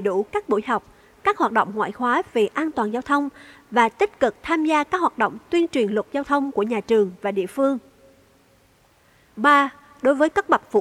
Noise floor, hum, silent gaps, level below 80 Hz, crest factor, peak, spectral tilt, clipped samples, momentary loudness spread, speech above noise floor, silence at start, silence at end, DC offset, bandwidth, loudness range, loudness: -58 dBFS; none; none; -60 dBFS; 18 dB; -4 dBFS; -5 dB/octave; under 0.1%; 6 LU; 37 dB; 0 s; 0 s; under 0.1%; 14 kHz; 2 LU; -22 LUFS